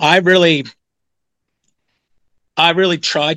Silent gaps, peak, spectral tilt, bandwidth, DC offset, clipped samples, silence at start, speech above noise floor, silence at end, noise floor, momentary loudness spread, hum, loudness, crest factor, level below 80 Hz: none; 0 dBFS; -4 dB/octave; 11.5 kHz; under 0.1%; under 0.1%; 0 s; 67 dB; 0 s; -80 dBFS; 12 LU; none; -13 LUFS; 16 dB; -64 dBFS